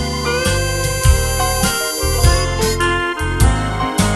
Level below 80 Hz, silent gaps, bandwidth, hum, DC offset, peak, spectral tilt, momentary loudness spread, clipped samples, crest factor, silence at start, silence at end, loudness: -20 dBFS; none; 13.5 kHz; none; under 0.1%; 0 dBFS; -4 dB/octave; 4 LU; under 0.1%; 16 dB; 0 s; 0 s; -16 LUFS